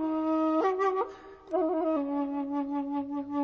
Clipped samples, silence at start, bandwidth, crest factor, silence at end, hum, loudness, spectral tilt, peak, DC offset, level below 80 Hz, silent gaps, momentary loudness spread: under 0.1%; 0 s; 6.8 kHz; 14 dB; 0 s; none; -30 LUFS; -6.5 dB/octave; -16 dBFS; under 0.1%; -66 dBFS; none; 7 LU